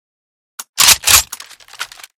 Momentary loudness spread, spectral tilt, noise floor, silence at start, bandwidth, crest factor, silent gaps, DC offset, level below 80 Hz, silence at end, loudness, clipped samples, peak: 21 LU; 1.5 dB/octave; -34 dBFS; 0.6 s; over 20 kHz; 16 dB; 0.69-0.73 s; under 0.1%; -40 dBFS; 0.35 s; -9 LUFS; 0.5%; 0 dBFS